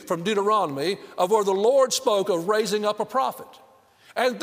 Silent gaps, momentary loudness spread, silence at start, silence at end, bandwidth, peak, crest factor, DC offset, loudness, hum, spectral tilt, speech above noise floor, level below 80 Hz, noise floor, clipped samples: none; 8 LU; 0 s; 0 s; 16 kHz; -8 dBFS; 16 dB; under 0.1%; -23 LUFS; none; -3.5 dB/octave; 32 dB; -74 dBFS; -54 dBFS; under 0.1%